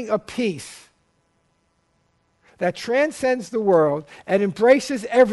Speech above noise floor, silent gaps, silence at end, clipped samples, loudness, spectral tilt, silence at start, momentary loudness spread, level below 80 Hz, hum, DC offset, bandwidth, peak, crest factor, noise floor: 47 dB; none; 0 s; under 0.1%; -21 LUFS; -5.5 dB/octave; 0 s; 9 LU; -62 dBFS; none; under 0.1%; 11.5 kHz; -2 dBFS; 18 dB; -67 dBFS